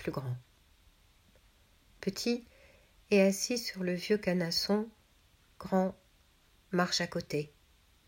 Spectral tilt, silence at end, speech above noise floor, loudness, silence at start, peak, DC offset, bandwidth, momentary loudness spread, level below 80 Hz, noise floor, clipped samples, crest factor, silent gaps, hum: -4.5 dB/octave; 0.6 s; 34 dB; -32 LUFS; 0 s; -14 dBFS; under 0.1%; 16.5 kHz; 13 LU; -64 dBFS; -66 dBFS; under 0.1%; 20 dB; none; none